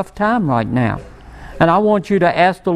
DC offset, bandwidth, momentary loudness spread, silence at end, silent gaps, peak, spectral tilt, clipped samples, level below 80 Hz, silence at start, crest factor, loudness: under 0.1%; 11.5 kHz; 6 LU; 0 s; none; 0 dBFS; -7.5 dB/octave; under 0.1%; -40 dBFS; 0 s; 16 dB; -15 LUFS